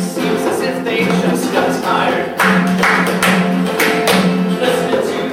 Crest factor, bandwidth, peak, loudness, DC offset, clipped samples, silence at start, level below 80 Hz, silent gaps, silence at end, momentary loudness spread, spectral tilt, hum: 14 dB; 17 kHz; 0 dBFS; -14 LUFS; under 0.1%; under 0.1%; 0 s; -52 dBFS; none; 0 s; 4 LU; -5 dB/octave; none